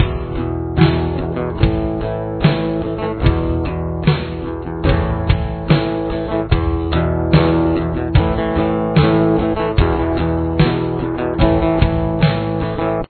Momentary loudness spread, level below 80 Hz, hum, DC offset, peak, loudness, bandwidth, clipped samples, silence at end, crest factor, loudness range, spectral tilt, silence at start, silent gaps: 7 LU; -24 dBFS; none; under 0.1%; 0 dBFS; -17 LUFS; 4.5 kHz; under 0.1%; 0.05 s; 16 dB; 3 LU; -11 dB/octave; 0 s; none